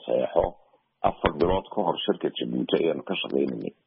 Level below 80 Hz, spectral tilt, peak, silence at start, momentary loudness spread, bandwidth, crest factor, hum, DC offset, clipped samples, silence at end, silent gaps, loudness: -46 dBFS; -4 dB/octave; -6 dBFS; 0 s; 5 LU; 5.4 kHz; 20 dB; none; under 0.1%; under 0.1%; 0.15 s; none; -27 LUFS